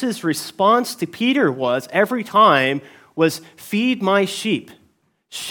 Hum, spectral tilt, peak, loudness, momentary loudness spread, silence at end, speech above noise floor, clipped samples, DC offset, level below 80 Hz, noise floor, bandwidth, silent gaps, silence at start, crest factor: none; -4.5 dB/octave; -2 dBFS; -18 LUFS; 13 LU; 0 s; 42 dB; under 0.1%; under 0.1%; -72 dBFS; -61 dBFS; 18 kHz; none; 0 s; 18 dB